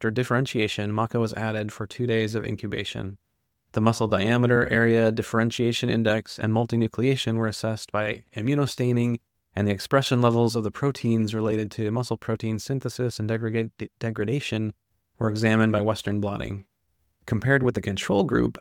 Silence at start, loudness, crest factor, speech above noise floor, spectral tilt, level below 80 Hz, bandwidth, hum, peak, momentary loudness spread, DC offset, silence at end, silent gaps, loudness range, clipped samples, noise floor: 0 s; -25 LUFS; 18 dB; 49 dB; -6.5 dB/octave; -54 dBFS; 16 kHz; none; -6 dBFS; 10 LU; under 0.1%; 0.1 s; none; 5 LU; under 0.1%; -73 dBFS